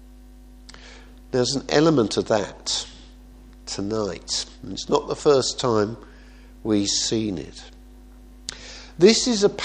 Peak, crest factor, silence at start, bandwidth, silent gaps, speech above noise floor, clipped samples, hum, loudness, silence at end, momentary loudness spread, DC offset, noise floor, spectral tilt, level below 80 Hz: -2 dBFS; 22 dB; 0 s; 10 kHz; none; 24 dB; under 0.1%; none; -22 LUFS; 0 s; 21 LU; under 0.1%; -45 dBFS; -4 dB/octave; -46 dBFS